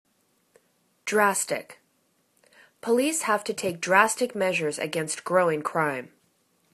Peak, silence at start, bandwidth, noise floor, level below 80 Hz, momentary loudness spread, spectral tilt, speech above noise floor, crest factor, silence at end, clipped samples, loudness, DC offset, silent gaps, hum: -2 dBFS; 1.05 s; 14 kHz; -69 dBFS; -74 dBFS; 9 LU; -3 dB/octave; 44 dB; 24 dB; 0.65 s; under 0.1%; -25 LUFS; under 0.1%; none; none